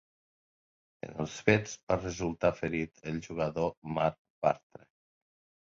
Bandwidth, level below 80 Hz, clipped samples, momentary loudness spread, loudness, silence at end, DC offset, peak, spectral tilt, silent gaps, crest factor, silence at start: 7.8 kHz; -56 dBFS; under 0.1%; 11 LU; -32 LUFS; 1.2 s; under 0.1%; -8 dBFS; -6 dB/octave; 1.83-1.87 s, 3.77-3.82 s, 4.18-4.42 s; 24 dB; 1.05 s